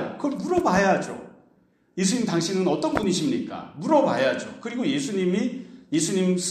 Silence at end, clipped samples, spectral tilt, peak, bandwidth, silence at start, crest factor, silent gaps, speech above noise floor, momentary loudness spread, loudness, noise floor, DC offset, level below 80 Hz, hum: 0 s; under 0.1%; -5 dB/octave; -6 dBFS; 14 kHz; 0 s; 18 dB; none; 38 dB; 12 LU; -24 LUFS; -62 dBFS; under 0.1%; -58 dBFS; none